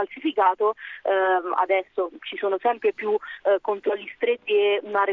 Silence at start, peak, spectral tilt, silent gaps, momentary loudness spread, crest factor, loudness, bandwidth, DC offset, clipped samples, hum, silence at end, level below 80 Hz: 0 s; -8 dBFS; -6 dB/octave; none; 7 LU; 16 dB; -24 LUFS; 4.1 kHz; under 0.1%; under 0.1%; none; 0 s; -74 dBFS